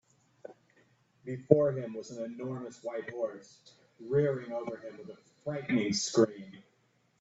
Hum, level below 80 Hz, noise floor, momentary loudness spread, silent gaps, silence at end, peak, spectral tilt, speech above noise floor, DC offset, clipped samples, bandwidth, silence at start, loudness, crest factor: none; -72 dBFS; -71 dBFS; 24 LU; none; 0.6 s; -6 dBFS; -5.5 dB/octave; 39 dB; under 0.1%; under 0.1%; 8.4 kHz; 0.45 s; -32 LUFS; 28 dB